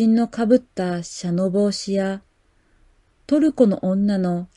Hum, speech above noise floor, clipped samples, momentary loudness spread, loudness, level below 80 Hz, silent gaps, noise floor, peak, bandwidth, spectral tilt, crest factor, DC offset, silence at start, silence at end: none; 41 dB; under 0.1%; 8 LU; -20 LUFS; -56 dBFS; none; -60 dBFS; -4 dBFS; 11.5 kHz; -6.5 dB/octave; 16 dB; under 0.1%; 0 s; 0.1 s